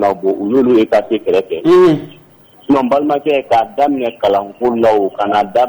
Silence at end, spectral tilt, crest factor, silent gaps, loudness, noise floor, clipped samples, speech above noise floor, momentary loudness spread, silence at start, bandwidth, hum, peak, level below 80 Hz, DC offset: 0 s; -7 dB/octave; 10 dB; none; -13 LUFS; -44 dBFS; under 0.1%; 31 dB; 6 LU; 0 s; over 20 kHz; none; -4 dBFS; -50 dBFS; under 0.1%